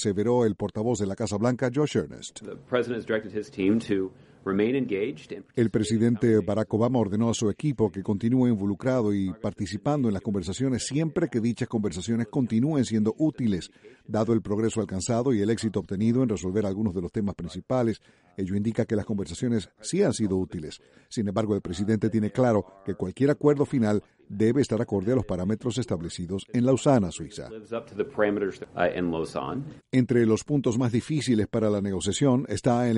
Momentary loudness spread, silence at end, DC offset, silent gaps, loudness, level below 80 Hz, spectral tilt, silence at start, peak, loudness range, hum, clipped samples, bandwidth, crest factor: 9 LU; 0 s; under 0.1%; none; -26 LUFS; -56 dBFS; -6.5 dB/octave; 0 s; -8 dBFS; 3 LU; none; under 0.1%; 11.5 kHz; 18 dB